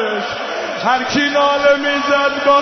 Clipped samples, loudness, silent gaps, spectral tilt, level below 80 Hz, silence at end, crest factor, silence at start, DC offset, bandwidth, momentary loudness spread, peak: under 0.1%; -15 LUFS; none; -3 dB/octave; -52 dBFS; 0 s; 14 dB; 0 s; under 0.1%; 6.4 kHz; 8 LU; -2 dBFS